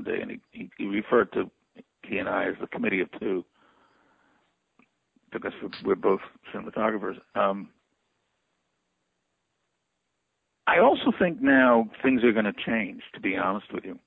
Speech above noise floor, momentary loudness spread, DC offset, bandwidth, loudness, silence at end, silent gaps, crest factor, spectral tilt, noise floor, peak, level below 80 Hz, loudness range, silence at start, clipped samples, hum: 54 dB; 16 LU; under 0.1%; 5.2 kHz; -26 LUFS; 0.1 s; none; 20 dB; -8.5 dB/octave; -79 dBFS; -8 dBFS; -64 dBFS; 11 LU; 0 s; under 0.1%; none